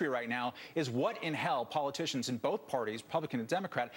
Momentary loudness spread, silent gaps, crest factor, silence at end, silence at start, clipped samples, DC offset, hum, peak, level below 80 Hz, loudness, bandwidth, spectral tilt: 3 LU; none; 18 dB; 0 s; 0 s; under 0.1%; under 0.1%; none; -18 dBFS; -82 dBFS; -35 LUFS; 17 kHz; -4.5 dB/octave